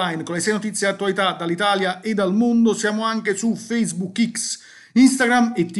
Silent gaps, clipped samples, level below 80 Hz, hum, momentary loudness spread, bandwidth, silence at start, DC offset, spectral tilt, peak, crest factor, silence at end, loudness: none; under 0.1%; -68 dBFS; none; 7 LU; 12 kHz; 0 s; under 0.1%; -4 dB/octave; -4 dBFS; 16 dB; 0 s; -20 LUFS